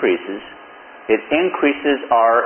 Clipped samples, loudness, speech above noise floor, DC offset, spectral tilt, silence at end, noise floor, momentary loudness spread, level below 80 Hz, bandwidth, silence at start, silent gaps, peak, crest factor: under 0.1%; -18 LUFS; 24 dB; under 0.1%; -9.5 dB/octave; 0 s; -40 dBFS; 19 LU; -56 dBFS; 3.3 kHz; 0 s; none; -2 dBFS; 16 dB